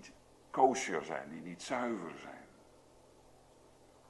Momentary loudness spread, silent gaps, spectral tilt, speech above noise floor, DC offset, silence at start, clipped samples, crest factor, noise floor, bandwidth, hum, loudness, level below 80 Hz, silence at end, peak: 21 LU; none; -4 dB/octave; 26 dB; under 0.1%; 0 s; under 0.1%; 26 dB; -62 dBFS; 12 kHz; none; -36 LUFS; -72 dBFS; 1.65 s; -14 dBFS